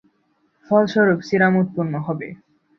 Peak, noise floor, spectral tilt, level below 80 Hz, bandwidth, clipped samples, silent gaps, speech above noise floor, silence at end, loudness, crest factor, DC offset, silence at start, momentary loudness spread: -2 dBFS; -65 dBFS; -8 dB/octave; -62 dBFS; 6.6 kHz; under 0.1%; none; 46 dB; 0.45 s; -19 LUFS; 18 dB; under 0.1%; 0.7 s; 11 LU